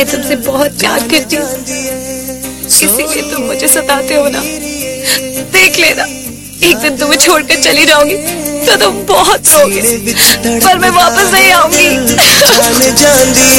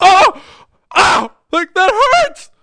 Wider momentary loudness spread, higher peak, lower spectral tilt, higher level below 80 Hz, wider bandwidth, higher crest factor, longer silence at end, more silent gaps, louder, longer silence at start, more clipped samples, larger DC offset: first, 12 LU vs 9 LU; about the same, 0 dBFS vs 0 dBFS; about the same, -1.5 dB/octave vs -2 dB/octave; first, -36 dBFS vs -44 dBFS; first, over 20 kHz vs 10.5 kHz; about the same, 8 dB vs 12 dB; second, 0 s vs 0.2 s; neither; first, -7 LUFS vs -12 LUFS; about the same, 0 s vs 0 s; first, 0.7% vs under 0.1%; neither